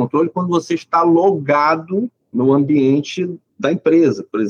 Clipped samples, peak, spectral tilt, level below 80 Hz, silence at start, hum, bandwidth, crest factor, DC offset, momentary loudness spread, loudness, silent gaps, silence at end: under 0.1%; -4 dBFS; -7 dB/octave; -68 dBFS; 0 s; none; 7.2 kHz; 12 dB; under 0.1%; 9 LU; -16 LUFS; none; 0 s